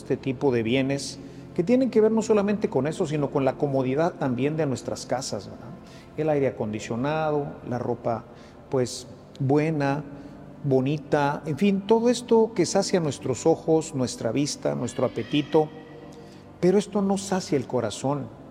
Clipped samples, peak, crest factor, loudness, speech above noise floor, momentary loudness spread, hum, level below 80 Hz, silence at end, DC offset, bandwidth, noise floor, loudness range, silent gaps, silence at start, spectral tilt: under 0.1%; -8 dBFS; 18 dB; -25 LUFS; 21 dB; 12 LU; none; -58 dBFS; 0 s; under 0.1%; 13.5 kHz; -45 dBFS; 5 LU; none; 0 s; -6 dB/octave